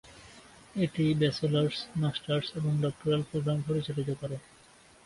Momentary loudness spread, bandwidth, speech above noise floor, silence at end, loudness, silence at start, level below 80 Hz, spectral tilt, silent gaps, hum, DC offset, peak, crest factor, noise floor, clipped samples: 13 LU; 11.5 kHz; 28 dB; 0.65 s; -31 LUFS; 0.05 s; -60 dBFS; -7 dB/octave; none; none; under 0.1%; -14 dBFS; 16 dB; -58 dBFS; under 0.1%